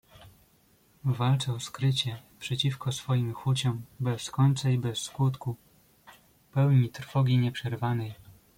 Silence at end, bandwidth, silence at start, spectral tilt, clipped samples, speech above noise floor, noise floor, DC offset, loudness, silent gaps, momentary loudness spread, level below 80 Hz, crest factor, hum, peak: 0.25 s; 16 kHz; 0.2 s; -6 dB/octave; under 0.1%; 36 dB; -64 dBFS; under 0.1%; -29 LUFS; none; 10 LU; -62 dBFS; 16 dB; none; -12 dBFS